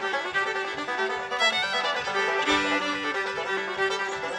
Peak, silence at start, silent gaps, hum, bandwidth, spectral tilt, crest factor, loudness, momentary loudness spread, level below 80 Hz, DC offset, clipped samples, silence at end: -10 dBFS; 0 s; none; none; 12.5 kHz; -2 dB/octave; 16 dB; -26 LUFS; 6 LU; -62 dBFS; under 0.1%; under 0.1%; 0 s